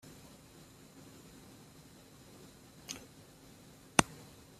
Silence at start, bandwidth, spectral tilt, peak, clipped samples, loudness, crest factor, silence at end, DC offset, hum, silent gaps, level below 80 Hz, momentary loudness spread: 0.05 s; 15.5 kHz; -3 dB/octave; -2 dBFS; under 0.1%; -34 LUFS; 40 dB; 0 s; under 0.1%; none; none; -64 dBFS; 26 LU